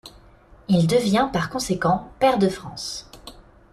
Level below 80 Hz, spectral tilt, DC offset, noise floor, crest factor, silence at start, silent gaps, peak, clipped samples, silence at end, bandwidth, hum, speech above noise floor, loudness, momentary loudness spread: -48 dBFS; -5.5 dB/octave; under 0.1%; -50 dBFS; 18 dB; 0.05 s; none; -6 dBFS; under 0.1%; 0.3 s; 14 kHz; none; 29 dB; -22 LUFS; 17 LU